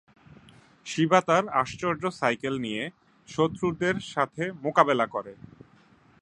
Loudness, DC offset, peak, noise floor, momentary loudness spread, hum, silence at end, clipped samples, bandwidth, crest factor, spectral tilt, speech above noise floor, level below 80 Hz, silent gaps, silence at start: -26 LUFS; under 0.1%; -2 dBFS; -58 dBFS; 13 LU; none; 0.9 s; under 0.1%; 11 kHz; 24 dB; -5.5 dB/octave; 32 dB; -62 dBFS; none; 0.85 s